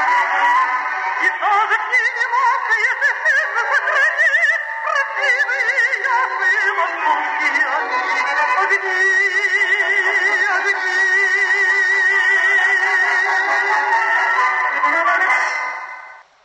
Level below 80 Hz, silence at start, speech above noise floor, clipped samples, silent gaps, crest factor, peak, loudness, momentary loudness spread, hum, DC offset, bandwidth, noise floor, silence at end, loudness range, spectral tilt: -84 dBFS; 0 s; 21 dB; under 0.1%; none; 12 dB; -6 dBFS; -15 LUFS; 5 LU; none; under 0.1%; 10.5 kHz; -38 dBFS; 0.25 s; 3 LU; 1.5 dB/octave